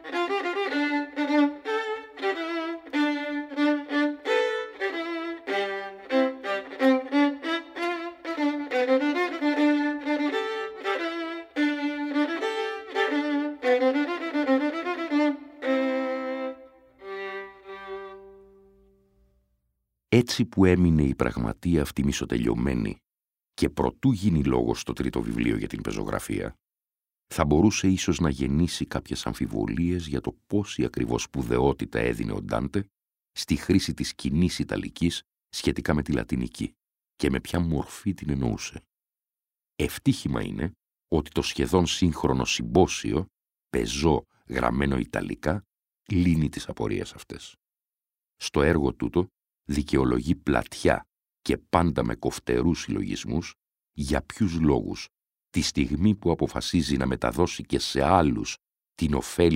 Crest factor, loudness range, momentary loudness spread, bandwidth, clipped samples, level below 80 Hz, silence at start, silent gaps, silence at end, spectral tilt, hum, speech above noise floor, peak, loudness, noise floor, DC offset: 24 dB; 5 LU; 10 LU; 16 kHz; under 0.1%; -42 dBFS; 0 s; none; 0 s; -5.5 dB/octave; none; over 65 dB; -2 dBFS; -26 LUFS; under -90 dBFS; under 0.1%